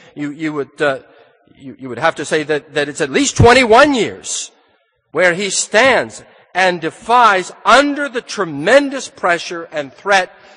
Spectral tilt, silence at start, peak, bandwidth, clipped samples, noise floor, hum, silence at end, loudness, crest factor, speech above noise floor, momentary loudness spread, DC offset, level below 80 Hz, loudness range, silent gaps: -3.5 dB/octave; 0.15 s; 0 dBFS; 10.5 kHz; under 0.1%; -59 dBFS; none; 0.3 s; -14 LUFS; 16 dB; 44 dB; 14 LU; under 0.1%; -40 dBFS; 3 LU; none